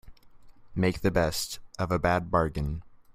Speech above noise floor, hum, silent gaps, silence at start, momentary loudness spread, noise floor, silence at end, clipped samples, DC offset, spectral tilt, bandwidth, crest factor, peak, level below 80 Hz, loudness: 23 dB; none; none; 0.05 s; 10 LU; -50 dBFS; 0.15 s; under 0.1%; under 0.1%; -5.5 dB/octave; 16 kHz; 20 dB; -10 dBFS; -44 dBFS; -28 LUFS